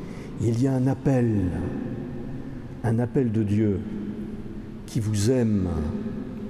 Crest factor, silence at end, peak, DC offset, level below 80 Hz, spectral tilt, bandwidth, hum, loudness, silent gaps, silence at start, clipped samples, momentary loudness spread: 14 dB; 0 s; -12 dBFS; under 0.1%; -44 dBFS; -7.5 dB/octave; 13.5 kHz; none; -26 LUFS; none; 0 s; under 0.1%; 13 LU